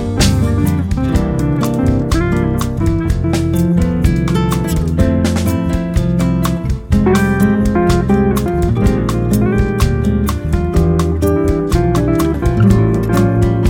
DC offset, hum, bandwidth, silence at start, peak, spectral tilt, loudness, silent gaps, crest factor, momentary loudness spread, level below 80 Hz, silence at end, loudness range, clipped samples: under 0.1%; none; 18 kHz; 0 s; 0 dBFS; -7 dB/octave; -14 LUFS; none; 12 dB; 4 LU; -20 dBFS; 0 s; 1 LU; under 0.1%